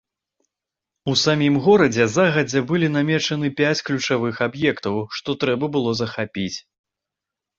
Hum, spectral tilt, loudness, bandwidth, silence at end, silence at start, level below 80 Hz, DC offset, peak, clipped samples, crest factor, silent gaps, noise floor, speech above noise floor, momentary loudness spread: none; -5 dB/octave; -20 LUFS; 7.8 kHz; 1 s; 1.05 s; -56 dBFS; under 0.1%; -4 dBFS; under 0.1%; 18 dB; none; -86 dBFS; 66 dB; 10 LU